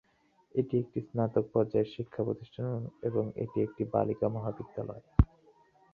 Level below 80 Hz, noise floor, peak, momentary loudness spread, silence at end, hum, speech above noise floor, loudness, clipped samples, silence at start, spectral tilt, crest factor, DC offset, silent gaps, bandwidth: -44 dBFS; -68 dBFS; -8 dBFS; 7 LU; 0.7 s; none; 37 dB; -33 LUFS; under 0.1%; 0.55 s; -11 dB/octave; 24 dB; under 0.1%; none; 4.9 kHz